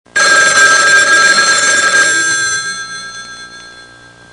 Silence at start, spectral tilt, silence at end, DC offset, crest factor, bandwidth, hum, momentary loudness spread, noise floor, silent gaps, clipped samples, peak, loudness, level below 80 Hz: 0.15 s; 1 dB/octave; 0.5 s; 0.2%; 12 dB; 12 kHz; none; 19 LU; -38 dBFS; none; 0.2%; 0 dBFS; -7 LUFS; -54 dBFS